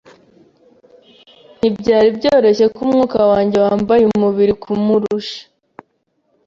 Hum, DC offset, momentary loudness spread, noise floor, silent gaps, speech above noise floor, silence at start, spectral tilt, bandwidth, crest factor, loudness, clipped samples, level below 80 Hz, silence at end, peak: none; under 0.1%; 7 LU; -65 dBFS; none; 51 dB; 1.65 s; -7 dB/octave; 7.4 kHz; 14 dB; -14 LUFS; under 0.1%; -50 dBFS; 1.05 s; -2 dBFS